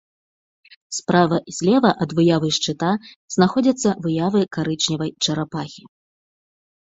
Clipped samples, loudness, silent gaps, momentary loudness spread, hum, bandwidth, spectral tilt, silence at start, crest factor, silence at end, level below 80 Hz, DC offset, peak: under 0.1%; -20 LUFS; 3.16-3.28 s; 10 LU; none; 8 kHz; -5 dB/octave; 0.9 s; 20 dB; 1.05 s; -58 dBFS; under 0.1%; 0 dBFS